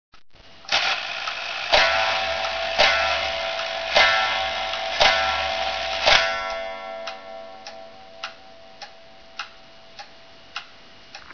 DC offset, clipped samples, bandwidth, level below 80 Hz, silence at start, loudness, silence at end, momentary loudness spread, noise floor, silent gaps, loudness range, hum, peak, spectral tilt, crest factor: 0.4%; under 0.1%; 5.4 kHz; -48 dBFS; 0.4 s; -20 LUFS; 0 s; 24 LU; -48 dBFS; none; 19 LU; none; 0 dBFS; -0.5 dB/octave; 24 dB